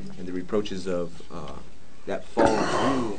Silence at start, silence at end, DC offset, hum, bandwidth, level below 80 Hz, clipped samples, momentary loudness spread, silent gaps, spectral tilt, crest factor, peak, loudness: 0 s; 0 s; 3%; none; 9.4 kHz; -50 dBFS; under 0.1%; 18 LU; none; -5.5 dB/octave; 24 dB; -2 dBFS; -27 LUFS